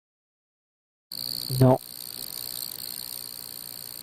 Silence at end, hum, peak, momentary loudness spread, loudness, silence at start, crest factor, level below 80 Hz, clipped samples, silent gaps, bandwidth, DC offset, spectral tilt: 0 s; none; -8 dBFS; 15 LU; -28 LUFS; 1.1 s; 22 dB; -56 dBFS; under 0.1%; none; 17 kHz; under 0.1%; -5.5 dB/octave